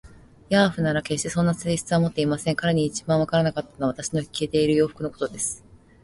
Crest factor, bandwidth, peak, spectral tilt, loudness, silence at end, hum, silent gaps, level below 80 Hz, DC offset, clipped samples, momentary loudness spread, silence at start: 18 dB; 11.5 kHz; -6 dBFS; -5 dB/octave; -24 LUFS; 0.45 s; none; none; -52 dBFS; under 0.1%; under 0.1%; 7 LU; 0.05 s